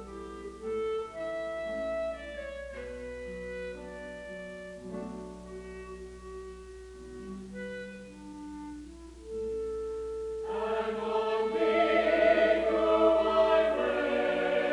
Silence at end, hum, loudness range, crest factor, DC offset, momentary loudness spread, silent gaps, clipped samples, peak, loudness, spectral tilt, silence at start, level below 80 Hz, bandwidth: 0 s; 60 Hz at -55 dBFS; 18 LU; 18 dB; under 0.1%; 20 LU; none; under 0.1%; -12 dBFS; -30 LUFS; -5.5 dB/octave; 0 s; -54 dBFS; 11 kHz